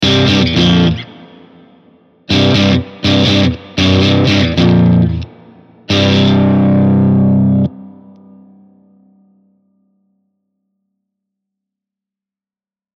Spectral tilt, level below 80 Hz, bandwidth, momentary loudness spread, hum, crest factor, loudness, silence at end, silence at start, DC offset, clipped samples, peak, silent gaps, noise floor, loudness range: -6.5 dB/octave; -36 dBFS; 7.6 kHz; 6 LU; none; 14 dB; -11 LUFS; 5.1 s; 0 s; under 0.1%; under 0.1%; 0 dBFS; none; under -90 dBFS; 5 LU